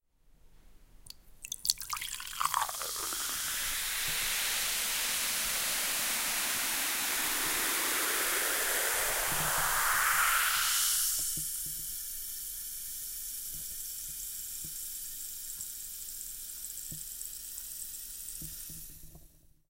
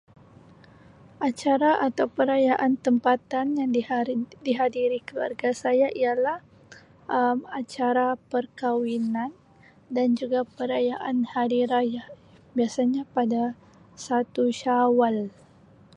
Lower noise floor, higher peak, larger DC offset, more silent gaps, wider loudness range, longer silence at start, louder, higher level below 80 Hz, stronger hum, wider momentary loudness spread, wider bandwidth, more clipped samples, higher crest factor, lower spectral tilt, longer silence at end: first, -61 dBFS vs -55 dBFS; first, -4 dBFS vs -8 dBFS; neither; neither; first, 11 LU vs 3 LU; second, 0.45 s vs 1.2 s; second, -31 LUFS vs -25 LUFS; first, -54 dBFS vs -68 dBFS; neither; first, 13 LU vs 9 LU; first, 17 kHz vs 10.5 kHz; neither; first, 30 dB vs 16 dB; second, 1 dB/octave vs -5.5 dB/octave; second, 0.45 s vs 0.65 s